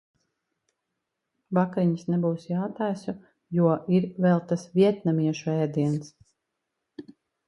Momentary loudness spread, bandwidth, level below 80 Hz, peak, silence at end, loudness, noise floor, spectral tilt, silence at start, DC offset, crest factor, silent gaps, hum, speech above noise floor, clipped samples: 12 LU; 10 kHz; -70 dBFS; -8 dBFS; 0.35 s; -26 LUFS; -82 dBFS; -8.5 dB/octave; 1.5 s; under 0.1%; 18 dB; none; none; 58 dB; under 0.1%